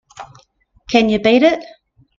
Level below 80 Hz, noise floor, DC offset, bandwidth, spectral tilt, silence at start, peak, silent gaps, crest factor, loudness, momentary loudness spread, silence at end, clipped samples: -50 dBFS; -54 dBFS; under 0.1%; 7.4 kHz; -5 dB/octave; 0.2 s; 0 dBFS; none; 18 dB; -14 LUFS; 6 LU; 0.55 s; under 0.1%